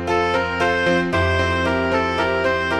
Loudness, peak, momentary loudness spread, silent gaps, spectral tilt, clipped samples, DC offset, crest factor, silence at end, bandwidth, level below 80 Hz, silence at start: -19 LUFS; -6 dBFS; 1 LU; none; -5.5 dB/octave; under 0.1%; under 0.1%; 14 dB; 0 s; 11.5 kHz; -40 dBFS; 0 s